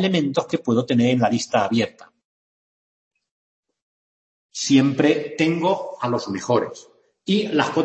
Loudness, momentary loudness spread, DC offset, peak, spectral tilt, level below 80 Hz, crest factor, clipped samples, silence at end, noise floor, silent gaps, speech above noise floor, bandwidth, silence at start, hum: -21 LUFS; 8 LU; under 0.1%; -2 dBFS; -5.5 dB/octave; -66 dBFS; 20 dB; under 0.1%; 0 s; under -90 dBFS; 2.25-3.11 s, 3.31-3.63 s, 3.82-4.49 s; over 70 dB; 8.6 kHz; 0 s; none